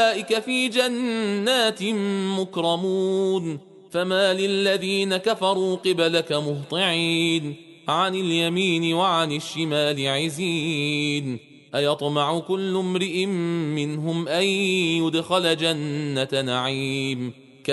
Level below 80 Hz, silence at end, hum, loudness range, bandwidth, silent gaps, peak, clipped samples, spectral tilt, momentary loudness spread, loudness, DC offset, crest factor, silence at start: -68 dBFS; 0 s; none; 2 LU; 11.5 kHz; none; -6 dBFS; under 0.1%; -4.5 dB/octave; 6 LU; -23 LUFS; under 0.1%; 16 dB; 0 s